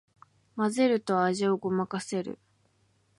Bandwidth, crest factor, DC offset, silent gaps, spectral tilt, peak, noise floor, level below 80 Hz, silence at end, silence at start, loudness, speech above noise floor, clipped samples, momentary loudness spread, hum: 11.5 kHz; 16 dB; under 0.1%; none; -5.5 dB/octave; -12 dBFS; -69 dBFS; -74 dBFS; 0.85 s; 0.55 s; -28 LUFS; 41 dB; under 0.1%; 15 LU; none